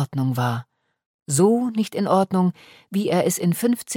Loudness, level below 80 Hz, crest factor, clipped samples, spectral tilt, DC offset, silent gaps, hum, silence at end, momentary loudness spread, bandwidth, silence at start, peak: -21 LUFS; -66 dBFS; 16 dB; under 0.1%; -6 dB/octave; under 0.1%; 1.06-1.26 s; none; 0 s; 7 LU; 17.5 kHz; 0 s; -6 dBFS